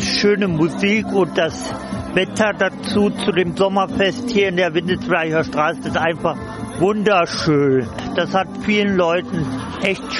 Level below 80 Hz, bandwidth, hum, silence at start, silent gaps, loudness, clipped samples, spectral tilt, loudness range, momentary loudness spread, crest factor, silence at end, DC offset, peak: -46 dBFS; 11.5 kHz; none; 0 s; none; -18 LUFS; under 0.1%; -5.5 dB/octave; 1 LU; 7 LU; 16 dB; 0 s; under 0.1%; -4 dBFS